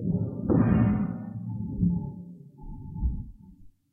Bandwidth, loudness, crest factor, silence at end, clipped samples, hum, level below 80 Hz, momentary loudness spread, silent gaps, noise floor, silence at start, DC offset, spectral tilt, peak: 3 kHz; -28 LUFS; 18 dB; 0.25 s; under 0.1%; none; -38 dBFS; 22 LU; none; -51 dBFS; 0 s; under 0.1%; -13 dB/octave; -10 dBFS